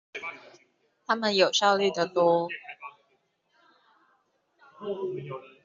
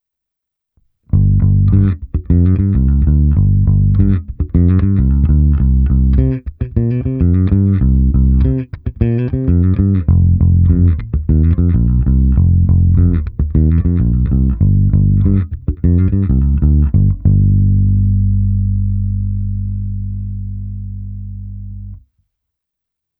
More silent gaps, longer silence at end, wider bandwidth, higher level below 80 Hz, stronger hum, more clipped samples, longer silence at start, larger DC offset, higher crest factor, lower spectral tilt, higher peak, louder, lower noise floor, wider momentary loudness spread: neither; second, 0.2 s vs 1.25 s; first, 7.6 kHz vs 2.7 kHz; second, -76 dBFS vs -18 dBFS; neither; neither; second, 0.15 s vs 1.15 s; neither; first, 22 dB vs 12 dB; second, -2 dB/octave vs -14.5 dB/octave; second, -8 dBFS vs 0 dBFS; second, -26 LUFS vs -14 LUFS; second, -71 dBFS vs -80 dBFS; first, 22 LU vs 10 LU